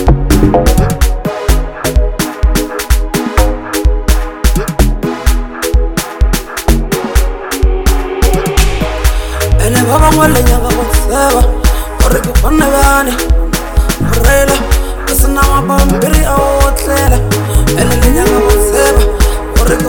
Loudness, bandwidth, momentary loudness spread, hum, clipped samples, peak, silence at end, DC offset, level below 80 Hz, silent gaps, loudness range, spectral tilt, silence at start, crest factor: -11 LUFS; 19 kHz; 6 LU; none; 0.2%; 0 dBFS; 0 s; under 0.1%; -12 dBFS; none; 4 LU; -5 dB/octave; 0 s; 10 dB